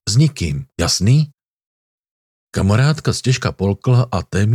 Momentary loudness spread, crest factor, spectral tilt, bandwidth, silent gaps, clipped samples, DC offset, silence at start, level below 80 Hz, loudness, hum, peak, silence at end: 8 LU; 14 dB; -5.5 dB/octave; 14 kHz; 1.45-1.60 s, 1.66-2.04 s, 2.11-2.47 s; under 0.1%; under 0.1%; 0.05 s; -40 dBFS; -17 LUFS; none; -2 dBFS; 0 s